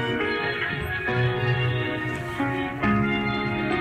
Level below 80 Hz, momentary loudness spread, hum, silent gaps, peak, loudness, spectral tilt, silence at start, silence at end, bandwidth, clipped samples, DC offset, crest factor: -46 dBFS; 4 LU; none; none; -10 dBFS; -25 LUFS; -7 dB/octave; 0 s; 0 s; 14 kHz; under 0.1%; under 0.1%; 14 dB